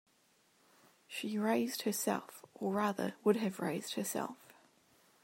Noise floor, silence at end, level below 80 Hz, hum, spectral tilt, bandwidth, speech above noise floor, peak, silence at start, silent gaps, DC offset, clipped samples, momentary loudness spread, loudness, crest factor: -72 dBFS; 0.7 s; -86 dBFS; none; -4.5 dB/octave; 16 kHz; 36 dB; -18 dBFS; 1.1 s; none; under 0.1%; under 0.1%; 11 LU; -36 LUFS; 20 dB